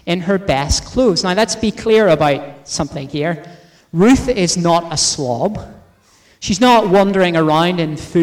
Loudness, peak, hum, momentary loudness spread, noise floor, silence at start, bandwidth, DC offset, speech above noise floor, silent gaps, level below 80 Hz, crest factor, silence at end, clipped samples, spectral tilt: -15 LUFS; -4 dBFS; none; 11 LU; -51 dBFS; 0.05 s; 16 kHz; under 0.1%; 37 dB; none; -36 dBFS; 12 dB; 0 s; under 0.1%; -4.5 dB/octave